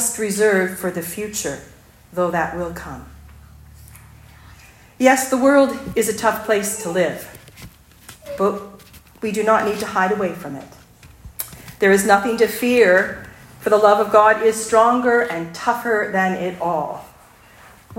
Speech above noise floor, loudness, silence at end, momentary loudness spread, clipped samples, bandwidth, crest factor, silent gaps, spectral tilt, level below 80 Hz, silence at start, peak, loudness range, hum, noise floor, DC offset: 30 dB; -18 LUFS; 0.05 s; 18 LU; under 0.1%; 16.5 kHz; 18 dB; none; -4 dB/octave; -50 dBFS; 0 s; 0 dBFS; 9 LU; none; -47 dBFS; under 0.1%